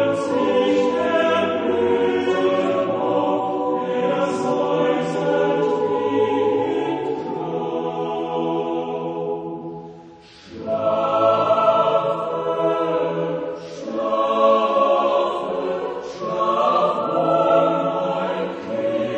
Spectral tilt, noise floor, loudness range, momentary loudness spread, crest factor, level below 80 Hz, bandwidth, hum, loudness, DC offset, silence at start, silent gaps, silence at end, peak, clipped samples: -6 dB/octave; -44 dBFS; 5 LU; 10 LU; 16 dB; -62 dBFS; 9.4 kHz; none; -20 LUFS; under 0.1%; 0 s; none; 0 s; -4 dBFS; under 0.1%